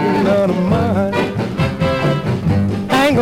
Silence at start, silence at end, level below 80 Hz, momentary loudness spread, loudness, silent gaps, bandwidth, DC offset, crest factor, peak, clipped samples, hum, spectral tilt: 0 s; 0 s; -36 dBFS; 4 LU; -16 LUFS; none; 16 kHz; under 0.1%; 12 dB; -4 dBFS; under 0.1%; none; -7 dB/octave